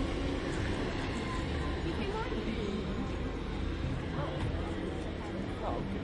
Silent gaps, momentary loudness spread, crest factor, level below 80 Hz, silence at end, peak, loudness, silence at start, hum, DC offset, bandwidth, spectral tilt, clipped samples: none; 3 LU; 14 dB; -40 dBFS; 0 s; -22 dBFS; -36 LUFS; 0 s; none; under 0.1%; 11 kHz; -6.5 dB/octave; under 0.1%